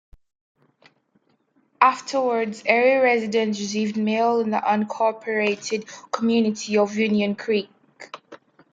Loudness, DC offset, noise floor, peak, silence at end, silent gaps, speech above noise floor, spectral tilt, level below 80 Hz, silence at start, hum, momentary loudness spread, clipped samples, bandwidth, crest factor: -22 LUFS; under 0.1%; -65 dBFS; 0 dBFS; 0.4 s; none; 44 dB; -4.5 dB/octave; -66 dBFS; 1.8 s; none; 11 LU; under 0.1%; 7.8 kHz; 22 dB